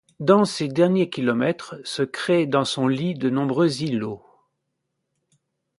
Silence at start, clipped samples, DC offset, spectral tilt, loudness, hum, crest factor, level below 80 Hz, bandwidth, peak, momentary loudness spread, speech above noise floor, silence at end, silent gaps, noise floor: 0.2 s; under 0.1%; under 0.1%; -6 dB/octave; -22 LUFS; none; 20 dB; -66 dBFS; 11.5 kHz; -2 dBFS; 9 LU; 56 dB; 1.6 s; none; -78 dBFS